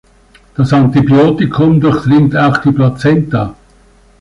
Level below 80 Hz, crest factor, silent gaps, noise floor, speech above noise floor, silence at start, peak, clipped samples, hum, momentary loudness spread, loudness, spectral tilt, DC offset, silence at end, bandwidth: -38 dBFS; 10 dB; none; -45 dBFS; 36 dB; 0.6 s; -2 dBFS; under 0.1%; none; 8 LU; -10 LUFS; -8.5 dB/octave; under 0.1%; 0.7 s; 11 kHz